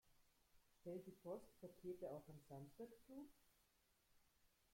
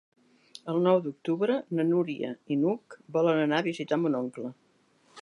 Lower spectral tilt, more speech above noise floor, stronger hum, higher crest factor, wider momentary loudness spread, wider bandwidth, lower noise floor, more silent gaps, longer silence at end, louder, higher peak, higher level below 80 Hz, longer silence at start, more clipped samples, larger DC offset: about the same, -7.5 dB/octave vs -7.5 dB/octave; second, 25 dB vs 37 dB; neither; about the same, 18 dB vs 18 dB; second, 7 LU vs 11 LU; first, 16.5 kHz vs 11 kHz; first, -82 dBFS vs -65 dBFS; neither; first, 0.25 s vs 0 s; second, -58 LUFS vs -28 LUFS; second, -42 dBFS vs -10 dBFS; about the same, -84 dBFS vs -82 dBFS; second, 0.05 s vs 0.65 s; neither; neither